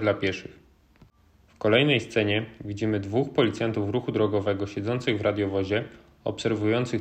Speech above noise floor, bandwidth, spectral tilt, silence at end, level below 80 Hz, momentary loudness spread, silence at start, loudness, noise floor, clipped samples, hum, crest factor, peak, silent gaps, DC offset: 34 dB; 9 kHz; -6.5 dB/octave; 0 s; -58 dBFS; 9 LU; 0 s; -26 LUFS; -59 dBFS; under 0.1%; none; 20 dB; -6 dBFS; none; under 0.1%